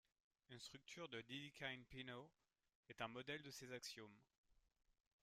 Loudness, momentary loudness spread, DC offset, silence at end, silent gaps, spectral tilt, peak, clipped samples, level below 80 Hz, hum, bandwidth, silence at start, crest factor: -55 LUFS; 11 LU; under 0.1%; 0.6 s; 2.75-2.83 s, 4.38-4.44 s; -3.5 dB/octave; -34 dBFS; under 0.1%; -82 dBFS; none; 15 kHz; 0.5 s; 24 dB